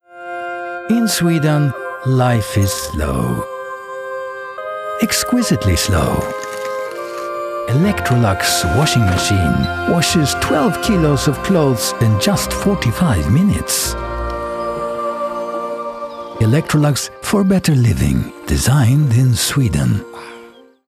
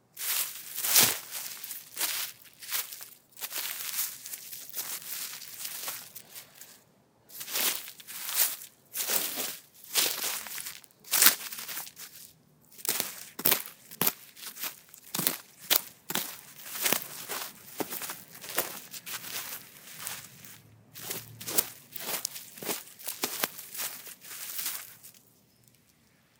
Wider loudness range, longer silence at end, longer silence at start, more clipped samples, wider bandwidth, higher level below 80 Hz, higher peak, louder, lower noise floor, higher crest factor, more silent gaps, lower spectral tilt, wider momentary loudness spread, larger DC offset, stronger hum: second, 5 LU vs 9 LU; second, 0.4 s vs 1.2 s; about the same, 0.1 s vs 0.15 s; neither; second, 16 kHz vs 19 kHz; first, -32 dBFS vs -82 dBFS; about the same, -2 dBFS vs 0 dBFS; first, -16 LUFS vs -30 LUFS; second, -41 dBFS vs -65 dBFS; second, 14 dB vs 34 dB; neither; first, -5 dB/octave vs 0 dB/octave; second, 12 LU vs 17 LU; neither; neither